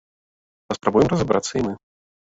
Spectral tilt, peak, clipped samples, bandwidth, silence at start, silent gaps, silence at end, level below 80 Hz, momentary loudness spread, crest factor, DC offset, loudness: -6 dB/octave; -2 dBFS; under 0.1%; 8 kHz; 0.7 s; none; 0.55 s; -48 dBFS; 12 LU; 20 dB; under 0.1%; -21 LUFS